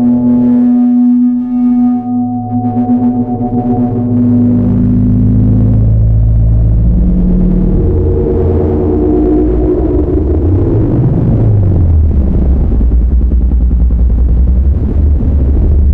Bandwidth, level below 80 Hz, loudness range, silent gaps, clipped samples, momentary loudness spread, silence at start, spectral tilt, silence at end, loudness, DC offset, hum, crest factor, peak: 2.5 kHz; -12 dBFS; 2 LU; none; under 0.1%; 3 LU; 0 s; -13.5 dB/octave; 0 s; -10 LUFS; under 0.1%; none; 6 dB; -2 dBFS